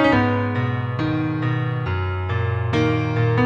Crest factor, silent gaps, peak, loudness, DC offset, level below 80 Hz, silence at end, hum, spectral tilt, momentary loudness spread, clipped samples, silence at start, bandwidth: 14 dB; none; -6 dBFS; -22 LUFS; under 0.1%; -44 dBFS; 0 s; none; -8 dB/octave; 5 LU; under 0.1%; 0 s; 7 kHz